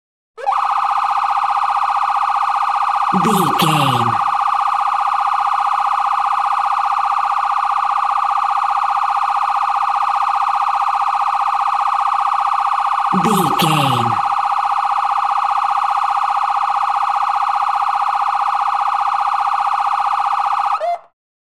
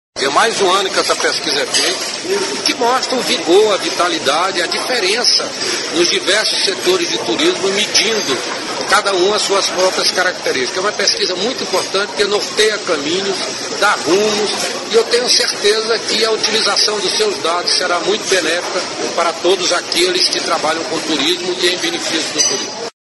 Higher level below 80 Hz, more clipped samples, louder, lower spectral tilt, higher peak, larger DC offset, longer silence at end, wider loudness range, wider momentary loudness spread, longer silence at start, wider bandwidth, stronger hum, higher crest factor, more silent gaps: second, -66 dBFS vs -58 dBFS; neither; about the same, -16 LUFS vs -14 LUFS; first, -4.5 dB/octave vs -1 dB/octave; about the same, -2 dBFS vs 0 dBFS; first, 0.3% vs under 0.1%; first, 0.45 s vs 0.1 s; about the same, 1 LU vs 2 LU; second, 2 LU vs 6 LU; first, 0.35 s vs 0.15 s; first, 16 kHz vs 12 kHz; first, 60 Hz at -55 dBFS vs none; about the same, 14 dB vs 16 dB; neither